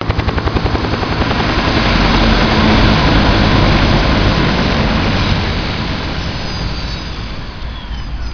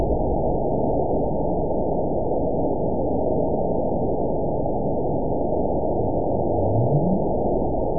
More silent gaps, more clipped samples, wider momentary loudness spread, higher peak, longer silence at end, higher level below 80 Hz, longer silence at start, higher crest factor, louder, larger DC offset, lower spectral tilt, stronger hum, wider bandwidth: neither; neither; first, 14 LU vs 3 LU; first, 0 dBFS vs -10 dBFS; about the same, 0 s vs 0 s; first, -18 dBFS vs -34 dBFS; about the same, 0 s vs 0 s; about the same, 14 dB vs 14 dB; first, -13 LUFS vs -23 LUFS; second, under 0.1% vs 4%; second, -6 dB/octave vs -19 dB/octave; neither; first, 5.4 kHz vs 1 kHz